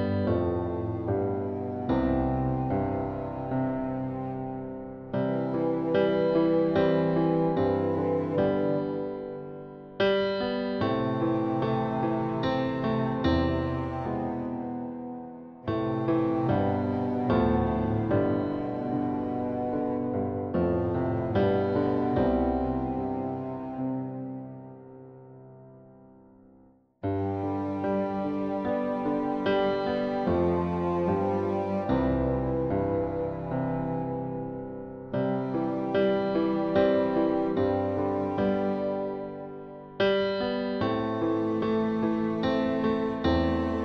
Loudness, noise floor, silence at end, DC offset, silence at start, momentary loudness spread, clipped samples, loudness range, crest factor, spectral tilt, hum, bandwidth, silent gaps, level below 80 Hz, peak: -28 LUFS; -59 dBFS; 0 s; under 0.1%; 0 s; 10 LU; under 0.1%; 5 LU; 16 dB; -9.5 dB/octave; none; 6.2 kHz; none; -46 dBFS; -12 dBFS